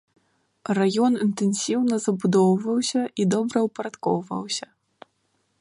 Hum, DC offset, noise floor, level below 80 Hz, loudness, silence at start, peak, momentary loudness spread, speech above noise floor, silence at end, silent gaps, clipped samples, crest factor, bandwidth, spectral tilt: none; under 0.1%; -70 dBFS; -70 dBFS; -23 LUFS; 0.7 s; -8 dBFS; 9 LU; 48 dB; 1 s; none; under 0.1%; 16 dB; 11.5 kHz; -5.5 dB/octave